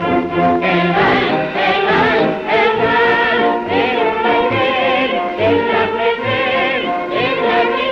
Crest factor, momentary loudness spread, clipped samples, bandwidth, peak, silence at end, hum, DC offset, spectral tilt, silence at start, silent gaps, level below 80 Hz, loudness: 12 dB; 4 LU; under 0.1%; 7 kHz; -4 dBFS; 0 s; none; under 0.1%; -6.5 dB/octave; 0 s; none; -46 dBFS; -14 LUFS